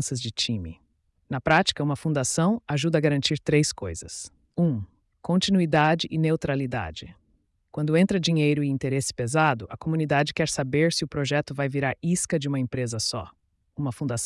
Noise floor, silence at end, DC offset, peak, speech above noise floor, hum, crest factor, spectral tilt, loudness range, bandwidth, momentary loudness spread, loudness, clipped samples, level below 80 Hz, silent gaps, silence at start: -68 dBFS; 0 s; under 0.1%; -8 dBFS; 43 dB; none; 18 dB; -5 dB/octave; 2 LU; 12 kHz; 13 LU; -25 LUFS; under 0.1%; -54 dBFS; none; 0 s